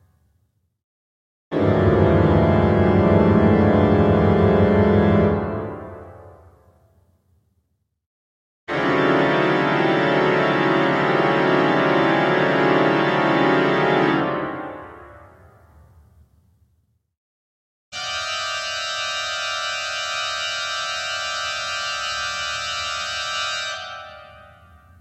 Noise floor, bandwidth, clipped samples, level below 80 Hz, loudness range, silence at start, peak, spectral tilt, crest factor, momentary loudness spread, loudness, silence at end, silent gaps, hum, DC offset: -70 dBFS; 12.5 kHz; under 0.1%; -40 dBFS; 12 LU; 1.5 s; -2 dBFS; -5.5 dB/octave; 18 dB; 12 LU; -19 LUFS; 0.7 s; 8.06-8.67 s, 17.17-17.92 s; none; under 0.1%